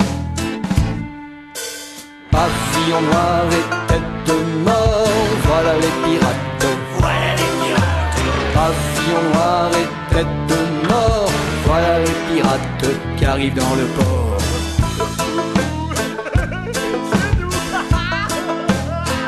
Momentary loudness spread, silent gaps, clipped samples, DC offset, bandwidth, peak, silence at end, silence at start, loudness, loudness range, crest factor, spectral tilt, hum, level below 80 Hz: 6 LU; none; under 0.1%; under 0.1%; 13 kHz; -2 dBFS; 0 s; 0 s; -17 LUFS; 3 LU; 14 dB; -5 dB/octave; none; -28 dBFS